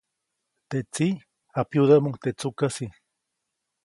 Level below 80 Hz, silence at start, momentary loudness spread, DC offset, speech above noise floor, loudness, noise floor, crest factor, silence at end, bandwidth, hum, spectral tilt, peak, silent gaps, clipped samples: -64 dBFS; 0.7 s; 15 LU; under 0.1%; 58 dB; -25 LUFS; -81 dBFS; 22 dB; 0.95 s; 11.5 kHz; none; -6.5 dB/octave; -6 dBFS; none; under 0.1%